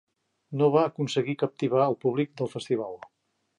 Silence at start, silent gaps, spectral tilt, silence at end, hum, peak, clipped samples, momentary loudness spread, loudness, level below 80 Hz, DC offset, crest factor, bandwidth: 0.5 s; none; -7 dB/octave; 0.65 s; none; -8 dBFS; under 0.1%; 12 LU; -27 LUFS; -76 dBFS; under 0.1%; 18 dB; 11 kHz